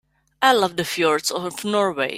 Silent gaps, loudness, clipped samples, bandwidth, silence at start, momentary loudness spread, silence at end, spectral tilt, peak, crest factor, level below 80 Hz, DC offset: none; -20 LUFS; under 0.1%; 16 kHz; 0.4 s; 7 LU; 0 s; -3 dB/octave; -2 dBFS; 18 dB; -62 dBFS; under 0.1%